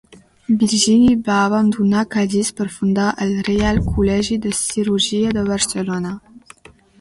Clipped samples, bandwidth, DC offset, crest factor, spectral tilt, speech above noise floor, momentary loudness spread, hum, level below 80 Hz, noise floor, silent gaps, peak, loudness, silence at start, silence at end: under 0.1%; 11.5 kHz; under 0.1%; 16 dB; -4.5 dB/octave; 29 dB; 9 LU; none; -36 dBFS; -45 dBFS; none; -2 dBFS; -17 LUFS; 0.1 s; 0.65 s